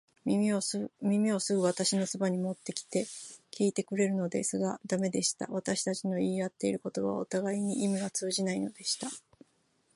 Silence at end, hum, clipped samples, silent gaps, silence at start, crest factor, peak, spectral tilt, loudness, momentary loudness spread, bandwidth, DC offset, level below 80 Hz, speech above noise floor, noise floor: 0.75 s; none; under 0.1%; none; 0.25 s; 20 dB; -12 dBFS; -4.5 dB/octave; -32 LUFS; 6 LU; 11.5 kHz; under 0.1%; -74 dBFS; 40 dB; -72 dBFS